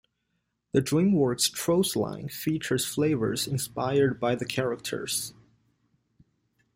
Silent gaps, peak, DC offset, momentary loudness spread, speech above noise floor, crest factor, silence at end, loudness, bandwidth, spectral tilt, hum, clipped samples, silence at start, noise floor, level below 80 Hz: none; -10 dBFS; under 0.1%; 7 LU; 51 dB; 18 dB; 1.45 s; -27 LUFS; 16.5 kHz; -4.5 dB/octave; none; under 0.1%; 0.75 s; -78 dBFS; -60 dBFS